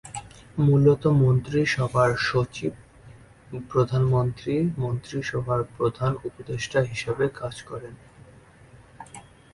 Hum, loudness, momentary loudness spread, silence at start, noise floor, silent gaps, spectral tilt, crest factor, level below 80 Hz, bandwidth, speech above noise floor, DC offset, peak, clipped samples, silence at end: none; -24 LUFS; 19 LU; 0.05 s; -51 dBFS; none; -7 dB/octave; 18 dB; -50 dBFS; 11.5 kHz; 27 dB; under 0.1%; -6 dBFS; under 0.1%; 0.35 s